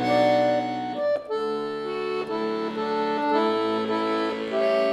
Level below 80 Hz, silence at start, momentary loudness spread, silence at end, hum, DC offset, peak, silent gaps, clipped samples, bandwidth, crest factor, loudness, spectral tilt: -64 dBFS; 0 s; 8 LU; 0 s; none; under 0.1%; -10 dBFS; none; under 0.1%; 12.5 kHz; 14 dB; -25 LUFS; -6 dB/octave